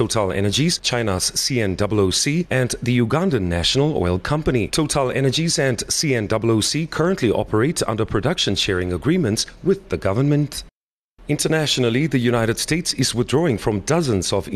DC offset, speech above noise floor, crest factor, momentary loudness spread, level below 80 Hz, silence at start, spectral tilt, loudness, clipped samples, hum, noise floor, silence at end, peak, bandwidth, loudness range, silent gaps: under 0.1%; 44 dB; 14 dB; 3 LU; -40 dBFS; 0 s; -4.5 dB/octave; -19 LUFS; under 0.1%; none; -64 dBFS; 0 s; -6 dBFS; 13.5 kHz; 2 LU; 10.73-11.15 s